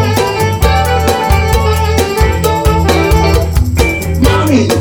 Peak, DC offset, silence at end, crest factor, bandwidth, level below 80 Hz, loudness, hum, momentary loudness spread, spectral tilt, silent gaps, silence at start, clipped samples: 0 dBFS; under 0.1%; 0 s; 10 dB; 19 kHz; -16 dBFS; -11 LUFS; none; 2 LU; -5.5 dB/octave; none; 0 s; under 0.1%